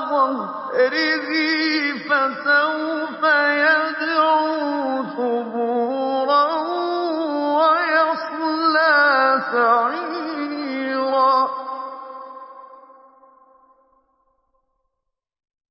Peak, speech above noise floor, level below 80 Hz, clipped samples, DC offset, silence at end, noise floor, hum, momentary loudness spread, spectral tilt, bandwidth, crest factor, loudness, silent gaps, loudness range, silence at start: -6 dBFS; 60 dB; -84 dBFS; under 0.1%; under 0.1%; 2.9 s; -79 dBFS; none; 10 LU; -7 dB/octave; 5.8 kHz; 16 dB; -19 LUFS; none; 6 LU; 0 s